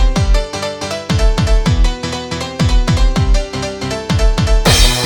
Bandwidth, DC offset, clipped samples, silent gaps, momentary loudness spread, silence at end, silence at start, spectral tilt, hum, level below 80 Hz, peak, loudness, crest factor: 19 kHz; under 0.1%; under 0.1%; none; 9 LU; 0 s; 0 s; -4.5 dB/octave; none; -14 dBFS; 0 dBFS; -15 LUFS; 12 dB